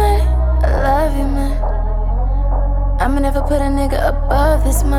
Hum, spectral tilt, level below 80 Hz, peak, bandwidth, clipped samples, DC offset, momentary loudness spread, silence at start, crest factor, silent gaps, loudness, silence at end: none; -6.5 dB/octave; -16 dBFS; -2 dBFS; 14.5 kHz; under 0.1%; 1%; 5 LU; 0 s; 12 dB; none; -17 LUFS; 0 s